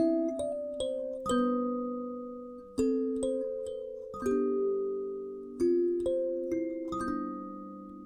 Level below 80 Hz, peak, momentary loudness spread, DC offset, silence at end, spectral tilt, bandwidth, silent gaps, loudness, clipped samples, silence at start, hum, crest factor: -60 dBFS; -18 dBFS; 12 LU; under 0.1%; 0 s; -5.5 dB/octave; 12 kHz; none; -33 LUFS; under 0.1%; 0 s; none; 14 dB